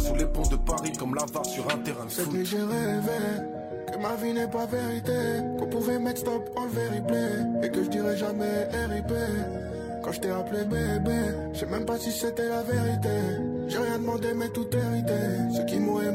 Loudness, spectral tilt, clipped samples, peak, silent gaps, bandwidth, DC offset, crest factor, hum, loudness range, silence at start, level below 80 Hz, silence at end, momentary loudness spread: -29 LUFS; -5.5 dB/octave; under 0.1%; -12 dBFS; none; 16 kHz; under 0.1%; 16 dB; none; 1 LU; 0 s; -38 dBFS; 0 s; 4 LU